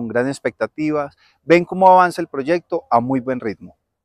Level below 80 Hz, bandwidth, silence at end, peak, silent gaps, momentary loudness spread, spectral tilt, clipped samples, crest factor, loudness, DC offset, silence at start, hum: -60 dBFS; 13 kHz; 0.35 s; 0 dBFS; none; 15 LU; -6.5 dB/octave; under 0.1%; 18 dB; -17 LUFS; under 0.1%; 0 s; none